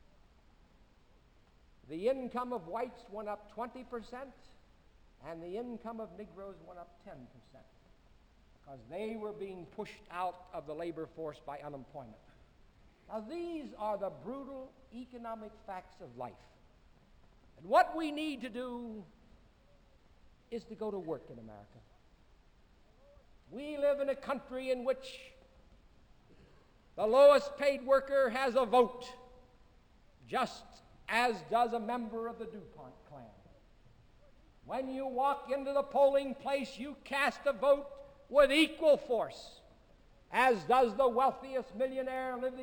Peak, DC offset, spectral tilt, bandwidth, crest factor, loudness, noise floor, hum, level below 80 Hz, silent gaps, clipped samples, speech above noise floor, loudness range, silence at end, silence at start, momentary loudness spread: -12 dBFS; under 0.1%; -4.5 dB/octave; 17 kHz; 24 dB; -33 LUFS; -64 dBFS; none; -64 dBFS; none; under 0.1%; 30 dB; 17 LU; 0 s; 1.9 s; 22 LU